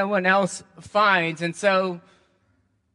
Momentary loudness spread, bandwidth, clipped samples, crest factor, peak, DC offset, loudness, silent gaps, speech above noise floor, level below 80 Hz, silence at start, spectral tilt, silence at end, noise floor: 12 LU; 11.5 kHz; under 0.1%; 18 dB; -6 dBFS; under 0.1%; -22 LUFS; none; 44 dB; -68 dBFS; 0 s; -4.5 dB/octave; 0.95 s; -67 dBFS